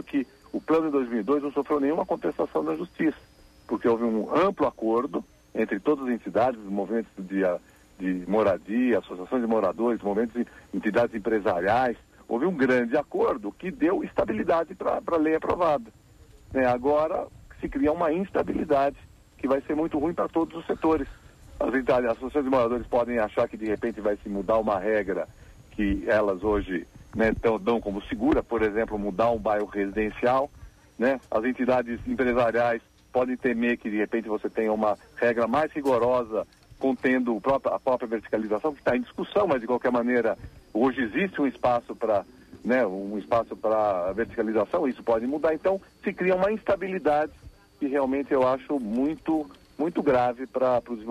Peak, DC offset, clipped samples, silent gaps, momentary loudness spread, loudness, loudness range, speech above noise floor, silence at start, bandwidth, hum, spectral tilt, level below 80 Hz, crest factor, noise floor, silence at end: -12 dBFS; under 0.1%; under 0.1%; none; 7 LU; -26 LUFS; 1 LU; 27 dB; 0 s; 13.5 kHz; none; -7.5 dB/octave; -50 dBFS; 14 dB; -52 dBFS; 0 s